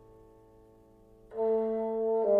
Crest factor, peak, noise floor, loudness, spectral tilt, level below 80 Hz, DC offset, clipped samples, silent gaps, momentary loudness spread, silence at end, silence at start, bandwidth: 16 dB; -16 dBFS; -58 dBFS; -31 LUFS; -9.5 dB/octave; -64 dBFS; under 0.1%; under 0.1%; none; 6 LU; 0 s; 1.3 s; 3.4 kHz